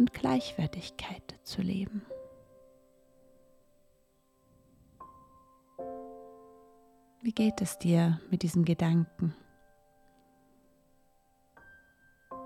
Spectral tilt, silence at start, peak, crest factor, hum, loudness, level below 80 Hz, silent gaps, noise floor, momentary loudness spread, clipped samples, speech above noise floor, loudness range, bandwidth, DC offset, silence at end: -6.5 dB/octave; 0 s; -14 dBFS; 20 dB; none; -31 LUFS; -62 dBFS; none; -69 dBFS; 26 LU; under 0.1%; 39 dB; 20 LU; 14 kHz; under 0.1%; 0 s